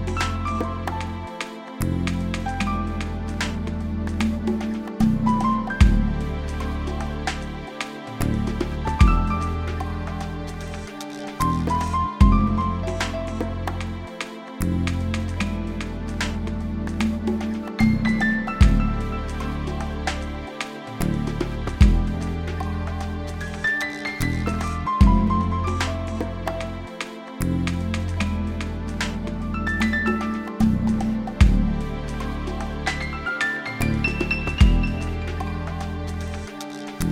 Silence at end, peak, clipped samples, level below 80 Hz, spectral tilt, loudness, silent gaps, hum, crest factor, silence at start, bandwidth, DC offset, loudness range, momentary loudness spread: 0 s; -2 dBFS; under 0.1%; -28 dBFS; -6 dB/octave; -25 LUFS; none; none; 20 dB; 0 s; 16.5 kHz; under 0.1%; 4 LU; 12 LU